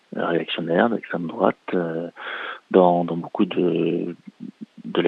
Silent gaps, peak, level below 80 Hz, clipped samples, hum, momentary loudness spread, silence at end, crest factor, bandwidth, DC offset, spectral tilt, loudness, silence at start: none; -2 dBFS; -72 dBFS; under 0.1%; none; 17 LU; 0 s; 22 dB; 5.2 kHz; under 0.1%; -8.5 dB/octave; -23 LUFS; 0.1 s